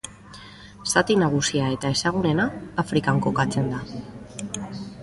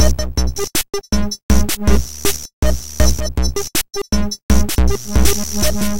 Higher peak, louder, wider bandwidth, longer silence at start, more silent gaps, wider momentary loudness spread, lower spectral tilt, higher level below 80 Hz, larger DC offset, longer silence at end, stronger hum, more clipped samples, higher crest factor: second, -4 dBFS vs 0 dBFS; second, -23 LUFS vs -18 LUFS; second, 12 kHz vs 17 kHz; about the same, 0.05 s vs 0 s; second, none vs 1.43-1.49 s, 2.53-2.62 s, 4.43-4.49 s; first, 18 LU vs 4 LU; about the same, -4.5 dB/octave vs -4 dB/octave; second, -50 dBFS vs -20 dBFS; second, under 0.1% vs 7%; about the same, 0 s vs 0 s; neither; neither; first, 20 dB vs 14 dB